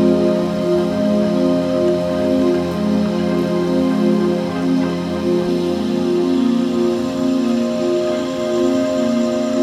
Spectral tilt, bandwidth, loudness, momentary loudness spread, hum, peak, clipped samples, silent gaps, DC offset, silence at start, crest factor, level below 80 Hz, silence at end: -7 dB/octave; 13.5 kHz; -17 LUFS; 3 LU; none; -4 dBFS; under 0.1%; none; under 0.1%; 0 s; 12 dB; -50 dBFS; 0 s